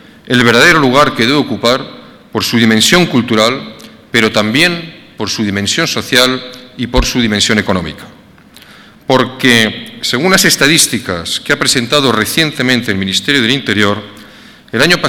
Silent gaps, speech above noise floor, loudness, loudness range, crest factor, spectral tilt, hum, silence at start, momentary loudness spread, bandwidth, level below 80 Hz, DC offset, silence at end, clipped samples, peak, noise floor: none; 28 dB; -10 LUFS; 3 LU; 12 dB; -3.5 dB/octave; none; 0.25 s; 14 LU; 19 kHz; -34 dBFS; under 0.1%; 0 s; 0.3%; 0 dBFS; -39 dBFS